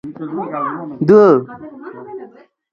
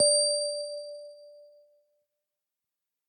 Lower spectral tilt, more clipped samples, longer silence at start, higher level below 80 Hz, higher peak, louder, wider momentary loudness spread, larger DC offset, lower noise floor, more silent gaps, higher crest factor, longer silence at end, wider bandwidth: first, -9.5 dB/octave vs 1.5 dB/octave; neither; about the same, 0.05 s vs 0 s; first, -60 dBFS vs -88 dBFS; first, 0 dBFS vs -12 dBFS; first, -14 LUFS vs -27 LUFS; about the same, 24 LU vs 23 LU; neither; second, -40 dBFS vs -88 dBFS; neither; about the same, 16 dB vs 20 dB; second, 0.45 s vs 1.65 s; second, 6.6 kHz vs 9.6 kHz